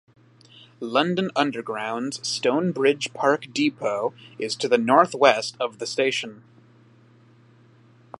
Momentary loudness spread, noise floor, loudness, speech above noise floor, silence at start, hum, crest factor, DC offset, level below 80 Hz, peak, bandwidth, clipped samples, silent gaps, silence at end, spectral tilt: 11 LU; -54 dBFS; -23 LUFS; 31 dB; 0.8 s; none; 24 dB; under 0.1%; -76 dBFS; 0 dBFS; 11.5 kHz; under 0.1%; none; 1.85 s; -4 dB/octave